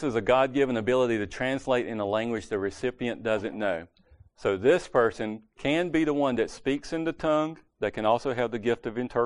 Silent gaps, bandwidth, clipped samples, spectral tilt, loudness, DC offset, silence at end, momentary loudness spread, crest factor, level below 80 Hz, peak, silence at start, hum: none; 10.5 kHz; under 0.1%; -6 dB/octave; -27 LUFS; under 0.1%; 0 s; 8 LU; 18 dB; -54 dBFS; -8 dBFS; 0 s; none